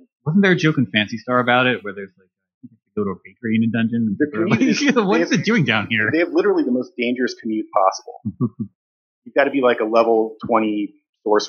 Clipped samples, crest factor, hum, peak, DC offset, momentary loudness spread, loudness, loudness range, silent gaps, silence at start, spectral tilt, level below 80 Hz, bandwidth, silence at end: under 0.1%; 18 dB; none; -2 dBFS; under 0.1%; 13 LU; -19 LUFS; 4 LU; 2.54-2.61 s, 8.75-9.22 s, 11.09-11.13 s; 0.25 s; -5.5 dB/octave; -66 dBFS; 7 kHz; 0 s